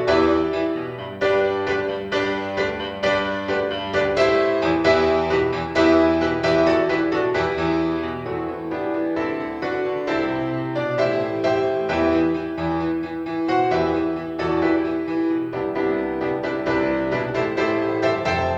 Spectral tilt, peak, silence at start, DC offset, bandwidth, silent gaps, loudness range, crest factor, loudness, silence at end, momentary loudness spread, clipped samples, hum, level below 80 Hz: -6.5 dB/octave; -4 dBFS; 0 s; under 0.1%; 7.8 kHz; none; 5 LU; 18 dB; -21 LUFS; 0 s; 8 LU; under 0.1%; none; -46 dBFS